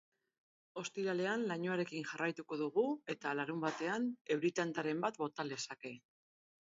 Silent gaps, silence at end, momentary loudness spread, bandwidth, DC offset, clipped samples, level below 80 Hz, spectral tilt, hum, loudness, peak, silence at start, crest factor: 4.21-4.25 s; 0.75 s; 9 LU; 7.6 kHz; under 0.1%; under 0.1%; -86 dBFS; -4 dB/octave; none; -39 LUFS; -22 dBFS; 0.75 s; 18 dB